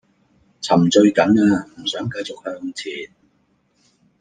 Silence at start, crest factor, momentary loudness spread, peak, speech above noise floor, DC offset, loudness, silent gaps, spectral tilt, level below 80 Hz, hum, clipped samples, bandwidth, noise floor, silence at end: 0.6 s; 18 dB; 17 LU; -2 dBFS; 46 dB; under 0.1%; -18 LUFS; none; -5.5 dB/octave; -58 dBFS; none; under 0.1%; 9.6 kHz; -63 dBFS; 1.15 s